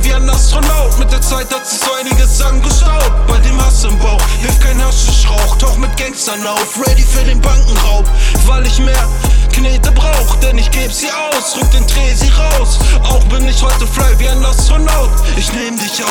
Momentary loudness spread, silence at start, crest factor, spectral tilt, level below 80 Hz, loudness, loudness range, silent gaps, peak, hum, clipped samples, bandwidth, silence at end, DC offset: 4 LU; 0 s; 8 dB; -4 dB/octave; -10 dBFS; -12 LUFS; 1 LU; none; 0 dBFS; none; under 0.1%; 17 kHz; 0 s; under 0.1%